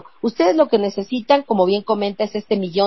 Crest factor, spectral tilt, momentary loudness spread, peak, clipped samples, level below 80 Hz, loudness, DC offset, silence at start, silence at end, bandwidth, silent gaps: 16 dB; -6.5 dB/octave; 8 LU; -2 dBFS; under 0.1%; -64 dBFS; -19 LUFS; 0.3%; 0.25 s; 0 s; 6 kHz; none